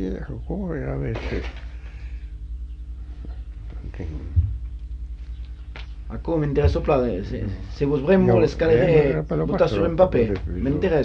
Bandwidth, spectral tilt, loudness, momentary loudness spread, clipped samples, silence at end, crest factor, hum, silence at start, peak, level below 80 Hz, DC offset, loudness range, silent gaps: 7.2 kHz; -9 dB/octave; -22 LUFS; 19 LU; under 0.1%; 0 s; 20 dB; 50 Hz at -35 dBFS; 0 s; -4 dBFS; -32 dBFS; under 0.1%; 12 LU; none